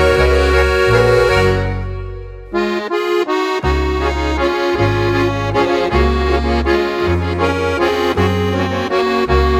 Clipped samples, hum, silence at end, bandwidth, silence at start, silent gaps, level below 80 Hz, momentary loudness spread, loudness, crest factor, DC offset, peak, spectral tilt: under 0.1%; none; 0 s; 15.5 kHz; 0 s; none; -22 dBFS; 7 LU; -15 LUFS; 14 dB; under 0.1%; 0 dBFS; -6.5 dB/octave